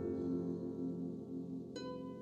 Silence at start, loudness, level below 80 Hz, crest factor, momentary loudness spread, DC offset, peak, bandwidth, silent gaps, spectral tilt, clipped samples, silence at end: 0 s; -43 LUFS; -72 dBFS; 12 dB; 7 LU; under 0.1%; -30 dBFS; 8 kHz; none; -8 dB/octave; under 0.1%; 0 s